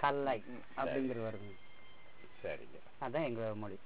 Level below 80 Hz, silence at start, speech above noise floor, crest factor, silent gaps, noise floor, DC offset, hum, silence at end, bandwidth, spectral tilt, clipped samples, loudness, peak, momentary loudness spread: -70 dBFS; 0 s; 22 dB; 22 dB; none; -61 dBFS; 0.5%; none; 0.1 s; 4 kHz; -4.5 dB/octave; under 0.1%; -40 LUFS; -18 dBFS; 22 LU